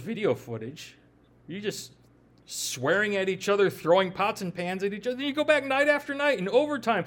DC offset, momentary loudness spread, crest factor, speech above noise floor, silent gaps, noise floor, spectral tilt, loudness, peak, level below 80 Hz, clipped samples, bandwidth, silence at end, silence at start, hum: under 0.1%; 15 LU; 20 dB; 31 dB; none; -58 dBFS; -4 dB/octave; -26 LUFS; -8 dBFS; -68 dBFS; under 0.1%; 18 kHz; 0 s; 0 s; none